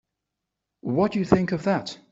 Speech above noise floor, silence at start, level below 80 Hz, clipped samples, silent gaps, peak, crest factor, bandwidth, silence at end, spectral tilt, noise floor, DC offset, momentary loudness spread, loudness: 60 dB; 0.85 s; -52 dBFS; under 0.1%; none; -4 dBFS; 22 dB; 7.8 kHz; 0.15 s; -7 dB/octave; -84 dBFS; under 0.1%; 7 LU; -24 LUFS